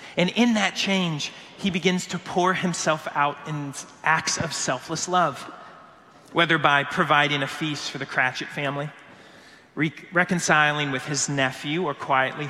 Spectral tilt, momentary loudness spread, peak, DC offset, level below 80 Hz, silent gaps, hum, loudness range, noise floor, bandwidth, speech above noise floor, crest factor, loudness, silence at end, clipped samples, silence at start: -3.5 dB/octave; 11 LU; -2 dBFS; under 0.1%; -64 dBFS; none; none; 3 LU; -50 dBFS; 14 kHz; 26 dB; 24 dB; -23 LUFS; 0 s; under 0.1%; 0 s